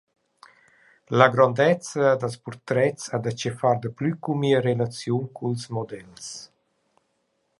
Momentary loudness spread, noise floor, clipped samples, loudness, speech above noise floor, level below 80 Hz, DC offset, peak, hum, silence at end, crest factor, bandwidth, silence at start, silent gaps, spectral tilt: 18 LU; -72 dBFS; under 0.1%; -23 LUFS; 49 dB; -66 dBFS; under 0.1%; 0 dBFS; none; 1.15 s; 24 dB; 11.5 kHz; 1.1 s; none; -6 dB/octave